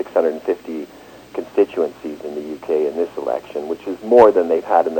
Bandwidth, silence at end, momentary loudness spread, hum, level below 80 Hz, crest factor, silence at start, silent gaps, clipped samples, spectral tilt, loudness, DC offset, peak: 17 kHz; 0 s; 18 LU; none; -58 dBFS; 18 dB; 0 s; none; under 0.1%; -6 dB/octave; -18 LUFS; under 0.1%; 0 dBFS